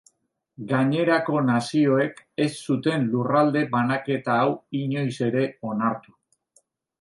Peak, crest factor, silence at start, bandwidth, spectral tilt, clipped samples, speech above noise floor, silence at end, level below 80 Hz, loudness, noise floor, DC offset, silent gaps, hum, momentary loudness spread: -8 dBFS; 16 dB; 0.6 s; 11.5 kHz; -7 dB/octave; under 0.1%; 46 dB; 1 s; -70 dBFS; -23 LUFS; -69 dBFS; under 0.1%; none; none; 7 LU